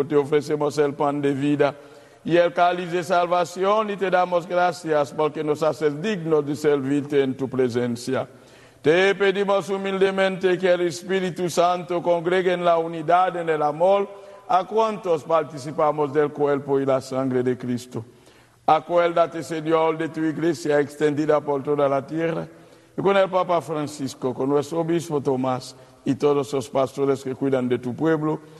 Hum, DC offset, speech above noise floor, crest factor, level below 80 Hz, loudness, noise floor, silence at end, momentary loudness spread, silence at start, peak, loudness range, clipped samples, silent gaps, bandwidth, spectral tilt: none; under 0.1%; 31 dB; 18 dB; -66 dBFS; -22 LUFS; -53 dBFS; 0 s; 7 LU; 0 s; -4 dBFS; 2 LU; under 0.1%; none; 12.5 kHz; -6 dB/octave